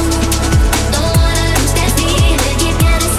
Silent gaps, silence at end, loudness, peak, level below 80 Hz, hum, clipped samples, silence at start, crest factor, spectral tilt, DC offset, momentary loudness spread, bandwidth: none; 0 s; -13 LUFS; -2 dBFS; -16 dBFS; none; under 0.1%; 0 s; 10 dB; -4 dB/octave; under 0.1%; 2 LU; 16 kHz